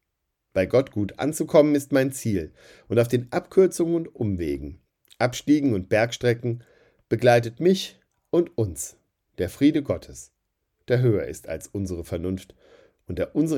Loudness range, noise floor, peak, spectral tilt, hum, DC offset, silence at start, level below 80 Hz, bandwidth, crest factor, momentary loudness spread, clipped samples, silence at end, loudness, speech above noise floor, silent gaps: 4 LU; -79 dBFS; -4 dBFS; -6 dB/octave; none; under 0.1%; 0.55 s; -54 dBFS; 17 kHz; 20 dB; 13 LU; under 0.1%; 0 s; -24 LUFS; 56 dB; none